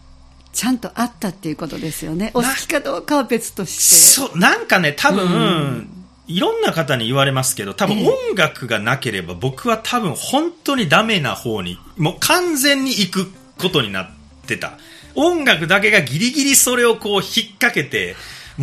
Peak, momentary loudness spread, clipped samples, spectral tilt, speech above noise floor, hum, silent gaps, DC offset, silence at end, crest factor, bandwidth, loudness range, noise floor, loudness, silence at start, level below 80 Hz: 0 dBFS; 13 LU; under 0.1%; -2.5 dB/octave; 27 dB; none; none; under 0.1%; 0 s; 18 dB; 15.5 kHz; 6 LU; -44 dBFS; -16 LUFS; 0.55 s; -48 dBFS